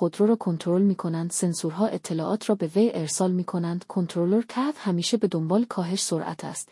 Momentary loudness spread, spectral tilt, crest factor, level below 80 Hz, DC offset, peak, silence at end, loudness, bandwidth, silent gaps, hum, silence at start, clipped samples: 6 LU; -5.5 dB/octave; 14 dB; -74 dBFS; under 0.1%; -10 dBFS; 0.05 s; -25 LUFS; 12 kHz; none; none; 0 s; under 0.1%